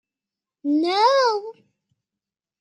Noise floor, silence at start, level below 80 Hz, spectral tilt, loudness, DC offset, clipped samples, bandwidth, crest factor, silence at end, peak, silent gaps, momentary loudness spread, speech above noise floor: -89 dBFS; 0.65 s; -88 dBFS; -2 dB/octave; -20 LUFS; under 0.1%; under 0.1%; 10.5 kHz; 18 dB; 1.1 s; -6 dBFS; none; 14 LU; 69 dB